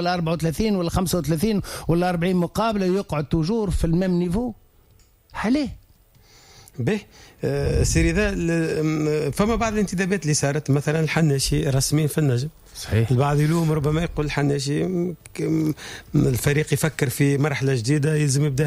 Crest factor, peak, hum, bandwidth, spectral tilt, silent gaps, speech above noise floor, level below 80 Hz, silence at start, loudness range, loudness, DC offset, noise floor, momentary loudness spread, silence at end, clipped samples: 12 dB; -8 dBFS; none; 16 kHz; -6 dB/octave; none; 34 dB; -36 dBFS; 0 s; 4 LU; -22 LUFS; under 0.1%; -55 dBFS; 6 LU; 0 s; under 0.1%